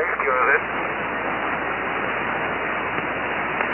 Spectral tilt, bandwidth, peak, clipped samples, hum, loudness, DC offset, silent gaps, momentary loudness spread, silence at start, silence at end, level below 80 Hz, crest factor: -8 dB/octave; 3.6 kHz; -6 dBFS; under 0.1%; none; -23 LUFS; under 0.1%; none; 6 LU; 0 s; 0 s; -50 dBFS; 16 dB